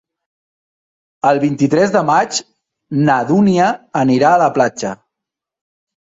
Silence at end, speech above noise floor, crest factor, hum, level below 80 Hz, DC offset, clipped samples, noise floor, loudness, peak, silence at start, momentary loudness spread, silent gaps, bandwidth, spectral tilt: 1.2 s; 70 dB; 16 dB; none; -58 dBFS; under 0.1%; under 0.1%; -83 dBFS; -14 LUFS; 0 dBFS; 1.25 s; 11 LU; none; 8 kHz; -5.5 dB/octave